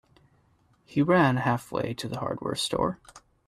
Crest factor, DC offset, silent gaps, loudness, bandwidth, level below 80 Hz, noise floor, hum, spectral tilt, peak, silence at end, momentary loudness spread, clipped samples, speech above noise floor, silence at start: 18 dB; under 0.1%; none; -27 LUFS; 13.5 kHz; -58 dBFS; -65 dBFS; none; -5.5 dB/octave; -10 dBFS; 0.3 s; 11 LU; under 0.1%; 38 dB; 0.9 s